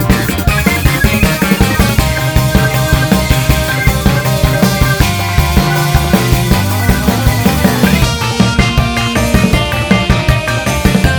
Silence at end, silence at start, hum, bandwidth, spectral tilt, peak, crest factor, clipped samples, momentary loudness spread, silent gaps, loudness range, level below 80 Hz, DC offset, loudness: 0 s; 0 s; none; over 20 kHz; -5 dB/octave; 0 dBFS; 10 dB; 1%; 2 LU; none; 0 LU; -18 dBFS; under 0.1%; -11 LUFS